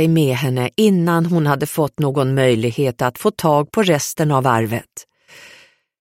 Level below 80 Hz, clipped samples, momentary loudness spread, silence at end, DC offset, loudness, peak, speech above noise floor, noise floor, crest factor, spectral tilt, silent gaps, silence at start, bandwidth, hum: -54 dBFS; under 0.1%; 4 LU; 1 s; under 0.1%; -17 LUFS; -2 dBFS; 32 dB; -49 dBFS; 14 dB; -6 dB/octave; none; 0 s; 16.5 kHz; none